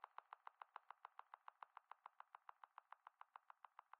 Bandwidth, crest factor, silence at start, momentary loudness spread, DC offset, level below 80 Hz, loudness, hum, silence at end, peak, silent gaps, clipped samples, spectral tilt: 4.3 kHz; 26 dB; 0 s; 4 LU; under 0.1%; under -90 dBFS; -64 LUFS; none; 0.05 s; -38 dBFS; none; under 0.1%; 4.5 dB/octave